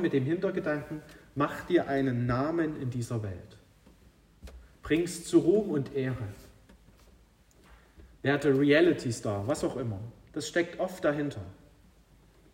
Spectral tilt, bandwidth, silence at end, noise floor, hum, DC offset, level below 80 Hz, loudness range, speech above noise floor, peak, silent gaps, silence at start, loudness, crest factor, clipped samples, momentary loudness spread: -6 dB/octave; 16 kHz; 1 s; -60 dBFS; none; under 0.1%; -56 dBFS; 5 LU; 32 dB; -12 dBFS; none; 0 s; -29 LUFS; 20 dB; under 0.1%; 17 LU